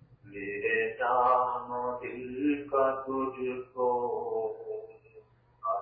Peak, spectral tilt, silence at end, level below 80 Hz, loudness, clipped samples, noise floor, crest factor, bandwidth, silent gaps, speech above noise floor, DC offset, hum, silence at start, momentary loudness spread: -14 dBFS; -4 dB/octave; 0 s; -66 dBFS; -31 LUFS; under 0.1%; -58 dBFS; 18 dB; 4.6 kHz; none; 27 dB; under 0.1%; none; 0.1 s; 14 LU